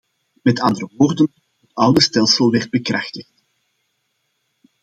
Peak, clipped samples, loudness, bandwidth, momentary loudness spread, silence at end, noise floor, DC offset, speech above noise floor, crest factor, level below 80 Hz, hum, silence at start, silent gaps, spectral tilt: 0 dBFS; under 0.1%; -16 LUFS; 13 kHz; 11 LU; 1.6 s; -70 dBFS; under 0.1%; 54 dB; 18 dB; -56 dBFS; none; 0.45 s; none; -4.5 dB/octave